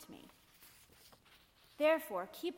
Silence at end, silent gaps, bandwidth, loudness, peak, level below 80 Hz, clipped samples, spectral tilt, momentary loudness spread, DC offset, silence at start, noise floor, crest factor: 0 s; none; 16.5 kHz; -35 LUFS; -22 dBFS; -76 dBFS; under 0.1%; -3.5 dB/octave; 27 LU; under 0.1%; 0 s; -66 dBFS; 20 dB